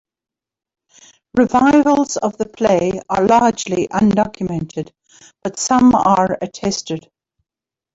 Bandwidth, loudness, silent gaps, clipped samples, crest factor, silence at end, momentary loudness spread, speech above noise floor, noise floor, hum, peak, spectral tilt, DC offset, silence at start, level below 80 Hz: 8 kHz; -16 LUFS; none; under 0.1%; 14 dB; 0.95 s; 15 LU; 73 dB; -88 dBFS; none; -2 dBFS; -5 dB/octave; under 0.1%; 1.35 s; -48 dBFS